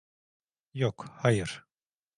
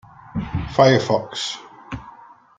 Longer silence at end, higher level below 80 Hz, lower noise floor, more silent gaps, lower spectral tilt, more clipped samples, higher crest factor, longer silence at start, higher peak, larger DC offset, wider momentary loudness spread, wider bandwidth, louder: first, 0.55 s vs 0.35 s; second, -60 dBFS vs -44 dBFS; first, under -90 dBFS vs -45 dBFS; neither; about the same, -6 dB/octave vs -5.5 dB/octave; neither; about the same, 24 dB vs 22 dB; first, 0.75 s vs 0.25 s; second, -10 dBFS vs 0 dBFS; neither; second, 16 LU vs 20 LU; first, 11 kHz vs 9.4 kHz; second, -30 LUFS vs -20 LUFS